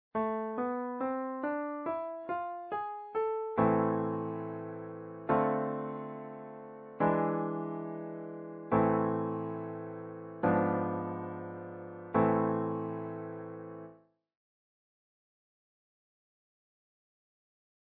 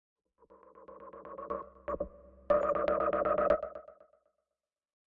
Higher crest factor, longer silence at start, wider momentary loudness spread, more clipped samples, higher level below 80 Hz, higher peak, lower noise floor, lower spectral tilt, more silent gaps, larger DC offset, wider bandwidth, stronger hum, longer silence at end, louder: about the same, 20 dB vs 20 dB; second, 0.15 s vs 0.75 s; second, 15 LU vs 21 LU; neither; second, -70 dBFS vs -58 dBFS; about the same, -16 dBFS vs -16 dBFS; second, -59 dBFS vs under -90 dBFS; first, -8.5 dB/octave vs -5 dB/octave; neither; neither; about the same, 4.5 kHz vs 4.9 kHz; neither; first, 3.95 s vs 1.25 s; about the same, -34 LUFS vs -32 LUFS